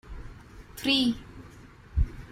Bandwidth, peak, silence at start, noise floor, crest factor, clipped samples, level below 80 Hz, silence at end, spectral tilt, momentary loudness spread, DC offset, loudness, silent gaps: 16 kHz; -10 dBFS; 0.05 s; -50 dBFS; 20 dB; under 0.1%; -36 dBFS; 0 s; -5 dB/octave; 24 LU; under 0.1%; -28 LUFS; none